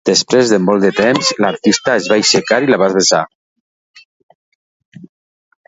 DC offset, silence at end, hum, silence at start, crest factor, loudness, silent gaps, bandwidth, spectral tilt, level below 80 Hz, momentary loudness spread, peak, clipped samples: under 0.1%; 0.6 s; none; 0.05 s; 14 dB; -12 LUFS; 3.35-3.94 s, 4.05-4.29 s, 4.35-4.92 s; 8 kHz; -3.5 dB/octave; -58 dBFS; 3 LU; 0 dBFS; under 0.1%